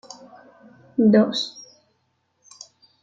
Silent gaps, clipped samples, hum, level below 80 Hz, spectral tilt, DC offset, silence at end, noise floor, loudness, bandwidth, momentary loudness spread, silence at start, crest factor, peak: none; under 0.1%; none; -70 dBFS; -6 dB/octave; under 0.1%; 1.4 s; -70 dBFS; -20 LUFS; 7.8 kHz; 27 LU; 1 s; 20 dB; -6 dBFS